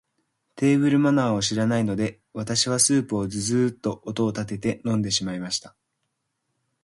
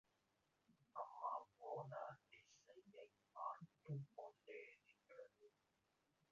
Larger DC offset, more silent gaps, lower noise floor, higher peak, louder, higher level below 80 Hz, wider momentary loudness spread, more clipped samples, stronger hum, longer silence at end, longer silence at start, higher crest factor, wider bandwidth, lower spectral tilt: neither; neither; second, -77 dBFS vs -86 dBFS; first, -6 dBFS vs -34 dBFS; first, -23 LUFS vs -55 LUFS; first, -56 dBFS vs under -90 dBFS; second, 10 LU vs 16 LU; neither; neither; first, 1.15 s vs 0.85 s; second, 0.55 s vs 0.7 s; about the same, 18 dB vs 22 dB; first, 11.5 kHz vs 7.2 kHz; second, -4.5 dB/octave vs -6 dB/octave